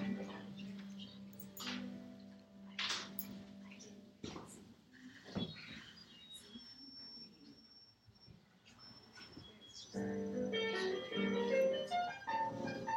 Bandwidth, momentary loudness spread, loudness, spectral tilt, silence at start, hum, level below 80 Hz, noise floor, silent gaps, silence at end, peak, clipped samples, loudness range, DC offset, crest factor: 16 kHz; 21 LU; -42 LUFS; -4.5 dB/octave; 0 s; none; -76 dBFS; -65 dBFS; none; 0 s; -24 dBFS; under 0.1%; 16 LU; under 0.1%; 20 dB